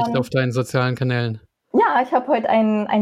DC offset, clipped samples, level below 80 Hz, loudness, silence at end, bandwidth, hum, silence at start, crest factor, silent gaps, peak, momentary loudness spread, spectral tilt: under 0.1%; under 0.1%; -62 dBFS; -20 LUFS; 0 s; 14 kHz; none; 0 s; 14 dB; none; -6 dBFS; 6 LU; -7 dB/octave